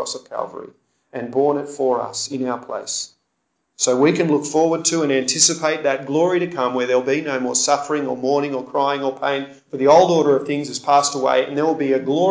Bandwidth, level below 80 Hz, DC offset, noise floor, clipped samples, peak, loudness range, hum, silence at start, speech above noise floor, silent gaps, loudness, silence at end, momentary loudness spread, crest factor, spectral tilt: 8 kHz; -68 dBFS; under 0.1%; -72 dBFS; under 0.1%; -2 dBFS; 5 LU; none; 0 s; 53 dB; none; -19 LUFS; 0 s; 12 LU; 18 dB; -3.5 dB/octave